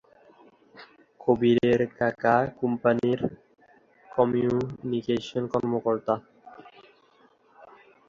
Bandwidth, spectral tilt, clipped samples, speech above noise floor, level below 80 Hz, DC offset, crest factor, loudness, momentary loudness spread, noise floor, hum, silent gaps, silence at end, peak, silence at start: 7.4 kHz; -7.5 dB/octave; under 0.1%; 36 dB; -60 dBFS; under 0.1%; 20 dB; -26 LUFS; 9 LU; -61 dBFS; none; none; 0.45 s; -8 dBFS; 0.75 s